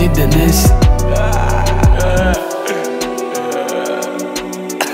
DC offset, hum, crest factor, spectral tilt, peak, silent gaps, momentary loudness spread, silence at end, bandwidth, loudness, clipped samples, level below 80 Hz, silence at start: under 0.1%; none; 12 dB; -5.5 dB/octave; 0 dBFS; none; 9 LU; 0 s; 16.5 kHz; -15 LUFS; under 0.1%; -16 dBFS; 0 s